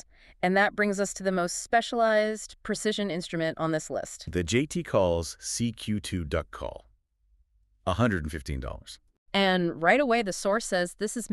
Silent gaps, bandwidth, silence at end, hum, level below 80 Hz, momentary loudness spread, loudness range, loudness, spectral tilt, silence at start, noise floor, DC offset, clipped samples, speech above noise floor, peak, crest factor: 9.18-9.26 s; 13.5 kHz; 0 s; none; -48 dBFS; 11 LU; 5 LU; -28 LUFS; -4.5 dB/octave; 0.4 s; -67 dBFS; under 0.1%; under 0.1%; 39 dB; -8 dBFS; 20 dB